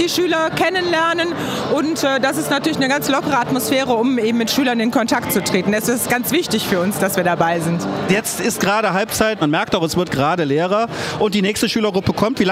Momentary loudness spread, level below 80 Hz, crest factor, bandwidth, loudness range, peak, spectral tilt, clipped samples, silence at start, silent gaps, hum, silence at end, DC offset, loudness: 2 LU; -48 dBFS; 16 dB; 16 kHz; 1 LU; -2 dBFS; -4 dB/octave; under 0.1%; 0 s; none; none; 0 s; under 0.1%; -17 LUFS